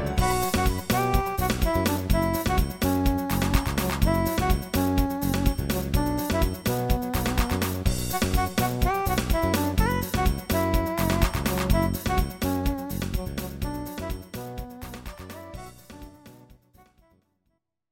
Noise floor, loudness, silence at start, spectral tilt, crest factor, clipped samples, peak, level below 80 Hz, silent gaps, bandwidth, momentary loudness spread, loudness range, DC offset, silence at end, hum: -75 dBFS; -26 LUFS; 0 s; -5.5 dB/octave; 18 dB; under 0.1%; -6 dBFS; -30 dBFS; none; 17 kHz; 13 LU; 12 LU; under 0.1%; 1.55 s; none